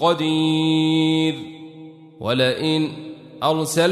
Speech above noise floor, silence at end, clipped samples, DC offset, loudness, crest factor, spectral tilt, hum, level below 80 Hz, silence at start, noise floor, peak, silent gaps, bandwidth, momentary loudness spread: 22 dB; 0 s; under 0.1%; under 0.1%; -20 LUFS; 16 dB; -5 dB/octave; none; -62 dBFS; 0 s; -41 dBFS; -6 dBFS; none; 13.5 kHz; 18 LU